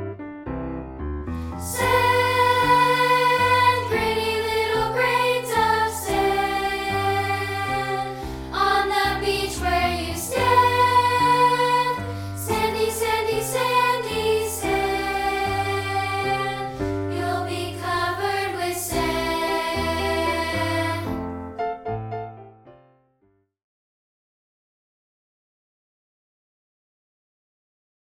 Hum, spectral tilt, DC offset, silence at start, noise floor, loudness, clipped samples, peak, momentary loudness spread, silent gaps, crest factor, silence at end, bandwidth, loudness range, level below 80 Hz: none; -4 dB/octave; under 0.1%; 0 s; -66 dBFS; -22 LUFS; under 0.1%; -4 dBFS; 13 LU; none; 18 dB; 5.3 s; 18.5 kHz; 7 LU; -42 dBFS